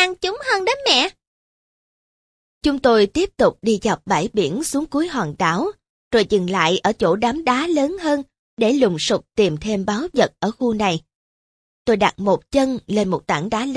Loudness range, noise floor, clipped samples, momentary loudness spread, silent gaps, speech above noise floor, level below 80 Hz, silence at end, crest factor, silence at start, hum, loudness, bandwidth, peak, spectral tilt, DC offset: 2 LU; under -90 dBFS; under 0.1%; 6 LU; 1.27-2.61 s, 5.89-6.11 s, 8.39-8.57 s, 11.15-11.85 s; over 71 dB; -48 dBFS; 0 s; 18 dB; 0 s; none; -19 LUFS; 11 kHz; -2 dBFS; -4.5 dB/octave; under 0.1%